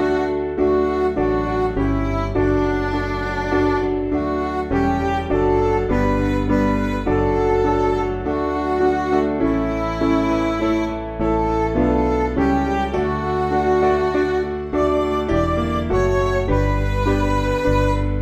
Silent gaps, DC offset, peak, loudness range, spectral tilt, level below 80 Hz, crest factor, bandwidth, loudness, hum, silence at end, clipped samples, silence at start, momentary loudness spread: none; under 0.1%; -6 dBFS; 1 LU; -7.5 dB/octave; -28 dBFS; 14 dB; 8.6 kHz; -20 LUFS; none; 0 s; under 0.1%; 0 s; 4 LU